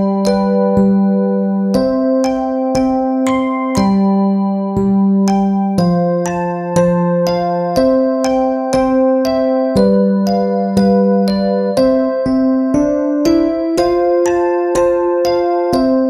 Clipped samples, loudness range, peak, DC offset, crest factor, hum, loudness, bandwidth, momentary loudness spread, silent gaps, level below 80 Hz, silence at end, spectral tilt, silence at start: under 0.1%; 1 LU; 0 dBFS; under 0.1%; 12 dB; none; -14 LUFS; 13 kHz; 3 LU; none; -40 dBFS; 0 s; -7.5 dB/octave; 0 s